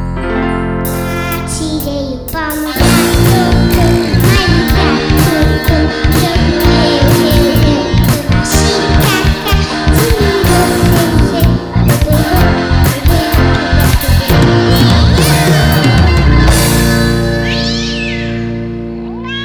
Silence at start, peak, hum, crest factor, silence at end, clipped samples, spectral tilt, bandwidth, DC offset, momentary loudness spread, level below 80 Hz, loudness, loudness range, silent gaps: 0 s; 0 dBFS; none; 10 dB; 0 s; under 0.1%; -5.5 dB/octave; over 20 kHz; under 0.1%; 8 LU; -16 dBFS; -10 LUFS; 3 LU; none